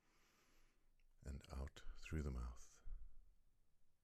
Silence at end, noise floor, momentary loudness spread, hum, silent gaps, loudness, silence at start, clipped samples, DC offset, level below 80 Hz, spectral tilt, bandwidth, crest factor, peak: 0.15 s; -76 dBFS; 14 LU; none; none; -54 LUFS; 0.55 s; under 0.1%; under 0.1%; -56 dBFS; -6 dB/octave; 14 kHz; 18 dB; -34 dBFS